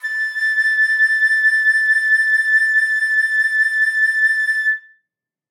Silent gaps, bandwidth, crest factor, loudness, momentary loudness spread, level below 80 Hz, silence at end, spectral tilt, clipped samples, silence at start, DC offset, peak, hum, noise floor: none; 15 kHz; 10 dB; -14 LUFS; 4 LU; under -90 dBFS; 0.7 s; 8.5 dB/octave; under 0.1%; 0.05 s; under 0.1%; -8 dBFS; none; -79 dBFS